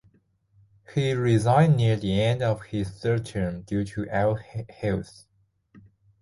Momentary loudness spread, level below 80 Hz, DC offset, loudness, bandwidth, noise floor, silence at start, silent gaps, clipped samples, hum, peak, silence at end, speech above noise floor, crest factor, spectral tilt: 12 LU; -50 dBFS; under 0.1%; -25 LUFS; 11.5 kHz; -64 dBFS; 0.9 s; none; under 0.1%; none; -8 dBFS; 0.4 s; 40 dB; 18 dB; -7.5 dB/octave